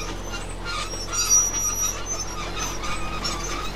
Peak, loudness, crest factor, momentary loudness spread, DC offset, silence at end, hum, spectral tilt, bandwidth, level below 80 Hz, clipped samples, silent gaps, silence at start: -10 dBFS; -24 LUFS; 18 dB; 14 LU; 1%; 0 s; none; -1 dB/octave; 16 kHz; -36 dBFS; under 0.1%; none; 0 s